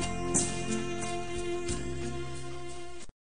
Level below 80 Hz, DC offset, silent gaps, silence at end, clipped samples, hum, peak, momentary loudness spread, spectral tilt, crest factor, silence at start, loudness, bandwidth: -46 dBFS; 1%; none; 0.15 s; under 0.1%; none; -14 dBFS; 14 LU; -4 dB/octave; 22 dB; 0 s; -34 LUFS; 10 kHz